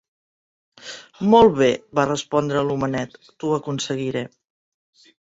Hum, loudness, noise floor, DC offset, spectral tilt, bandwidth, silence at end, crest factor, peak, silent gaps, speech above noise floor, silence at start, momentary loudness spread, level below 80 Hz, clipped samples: none; -20 LUFS; under -90 dBFS; under 0.1%; -5.5 dB/octave; 8 kHz; 0.95 s; 20 dB; -2 dBFS; none; over 70 dB; 0.85 s; 23 LU; -54 dBFS; under 0.1%